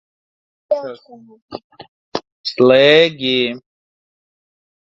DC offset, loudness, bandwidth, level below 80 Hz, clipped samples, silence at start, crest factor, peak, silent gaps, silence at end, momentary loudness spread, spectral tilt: under 0.1%; -14 LUFS; 7.4 kHz; -62 dBFS; under 0.1%; 0.7 s; 18 dB; 0 dBFS; 1.42-1.48 s, 1.64-1.70 s, 1.88-2.12 s, 2.32-2.44 s; 1.25 s; 25 LU; -5.5 dB/octave